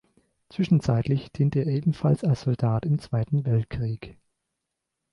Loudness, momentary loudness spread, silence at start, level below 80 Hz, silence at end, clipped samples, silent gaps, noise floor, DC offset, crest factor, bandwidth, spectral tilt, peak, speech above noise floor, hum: -25 LUFS; 8 LU; 0.55 s; -50 dBFS; 1 s; under 0.1%; none; -83 dBFS; under 0.1%; 16 dB; 10.5 kHz; -9 dB/octave; -10 dBFS; 59 dB; none